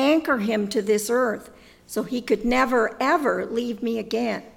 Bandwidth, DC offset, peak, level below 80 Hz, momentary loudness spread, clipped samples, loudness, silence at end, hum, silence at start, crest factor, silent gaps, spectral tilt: 17.5 kHz; under 0.1%; -8 dBFS; -50 dBFS; 8 LU; under 0.1%; -23 LUFS; 0.05 s; none; 0 s; 16 dB; none; -4.5 dB/octave